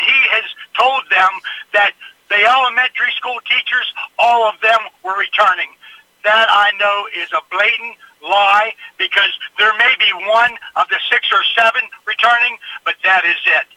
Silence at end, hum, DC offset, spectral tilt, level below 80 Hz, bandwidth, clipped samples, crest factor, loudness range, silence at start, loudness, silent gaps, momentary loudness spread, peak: 0.1 s; none; under 0.1%; -0.5 dB/octave; -70 dBFS; 15.5 kHz; under 0.1%; 14 dB; 2 LU; 0 s; -13 LUFS; none; 10 LU; 0 dBFS